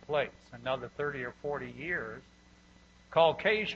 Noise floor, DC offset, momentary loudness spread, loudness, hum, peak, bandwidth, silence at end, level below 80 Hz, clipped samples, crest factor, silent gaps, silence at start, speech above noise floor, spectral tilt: -60 dBFS; under 0.1%; 13 LU; -32 LUFS; 60 Hz at -60 dBFS; -12 dBFS; 7.6 kHz; 0 s; -62 dBFS; under 0.1%; 22 dB; none; 0.1 s; 27 dB; -5.5 dB/octave